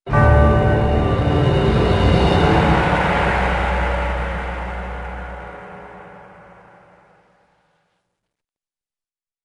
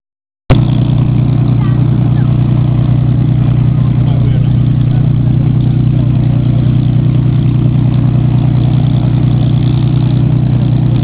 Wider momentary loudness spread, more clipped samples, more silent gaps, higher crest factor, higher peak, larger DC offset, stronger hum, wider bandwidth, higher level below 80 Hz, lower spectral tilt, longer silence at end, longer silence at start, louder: first, 18 LU vs 0 LU; neither; neither; first, 18 dB vs 10 dB; about the same, -2 dBFS vs 0 dBFS; neither; second, none vs 60 Hz at -15 dBFS; first, 10.5 kHz vs 4 kHz; about the same, -26 dBFS vs -24 dBFS; second, -7.5 dB/octave vs -12.5 dB/octave; first, 3.25 s vs 0 s; second, 0.05 s vs 0.5 s; second, -17 LUFS vs -10 LUFS